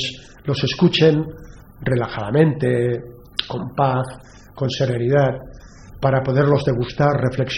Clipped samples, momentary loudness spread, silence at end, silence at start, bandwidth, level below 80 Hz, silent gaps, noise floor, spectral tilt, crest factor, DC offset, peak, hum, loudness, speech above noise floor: under 0.1%; 10 LU; 0 s; 0 s; 11 kHz; -44 dBFS; none; -40 dBFS; -7 dB/octave; 20 dB; under 0.1%; 0 dBFS; none; -19 LUFS; 21 dB